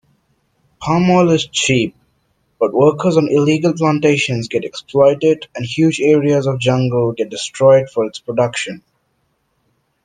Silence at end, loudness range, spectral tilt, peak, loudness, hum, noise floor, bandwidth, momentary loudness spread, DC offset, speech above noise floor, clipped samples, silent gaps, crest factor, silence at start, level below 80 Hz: 1.25 s; 2 LU; -5.5 dB/octave; 0 dBFS; -15 LUFS; none; -65 dBFS; 9.8 kHz; 10 LU; under 0.1%; 51 dB; under 0.1%; none; 14 dB; 0.8 s; -54 dBFS